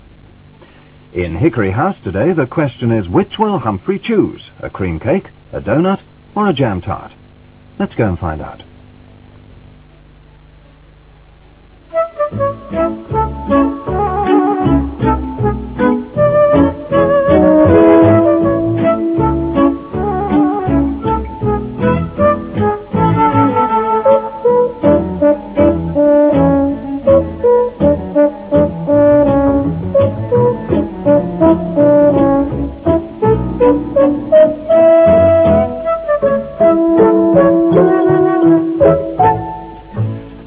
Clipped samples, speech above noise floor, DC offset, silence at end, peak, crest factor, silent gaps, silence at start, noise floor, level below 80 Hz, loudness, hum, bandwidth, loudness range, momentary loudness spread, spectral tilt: under 0.1%; 27 dB; under 0.1%; 0 s; 0 dBFS; 12 dB; none; 1.15 s; -42 dBFS; -32 dBFS; -13 LUFS; none; 4 kHz; 10 LU; 10 LU; -12 dB/octave